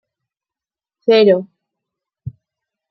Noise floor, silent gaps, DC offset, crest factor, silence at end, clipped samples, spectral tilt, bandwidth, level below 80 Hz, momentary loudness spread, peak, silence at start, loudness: under -90 dBFS; none; under 0.1%; 18 dB; 0.6 s; under 0.1%; -8 dB/octave; 6 kHz; -60 dBFS; 23 LU; -2 dBFS; 1.05 s; -14 LUFS